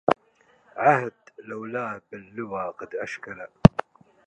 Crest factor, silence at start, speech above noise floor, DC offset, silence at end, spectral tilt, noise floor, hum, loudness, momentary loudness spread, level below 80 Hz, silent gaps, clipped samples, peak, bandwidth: 26 dB; 0.1 s; 34 dB; under 0.1%; 0.6 s; -8 dB/octave; -62 dBFS; none; -24 LUFS; 20 LU; -46 dBFS; none; under 0.1%; 0 dBFS; 9.2 kHz